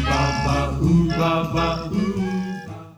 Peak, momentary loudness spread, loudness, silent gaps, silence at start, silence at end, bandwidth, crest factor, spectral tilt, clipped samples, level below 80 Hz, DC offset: -6 dBFS; 8 LU; -21 LUFS; none; 0 s; 0.05 s; 14 kHz; 14 dB; -6.5 dB/octave; under 0.1%; -32 dBFS; under 0.1%